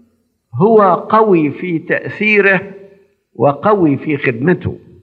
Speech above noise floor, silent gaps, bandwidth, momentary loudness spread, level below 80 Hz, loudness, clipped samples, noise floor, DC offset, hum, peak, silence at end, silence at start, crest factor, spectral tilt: 45 dB; none; 5 kHz; 9 LU; -60 dBFS; -13 LUFS; under 0.1%; -58 dBFS; under 0.1%; none; 0 dBFS; 0.25 s; 0.55 s; 14 dB; -9.5 dB/octave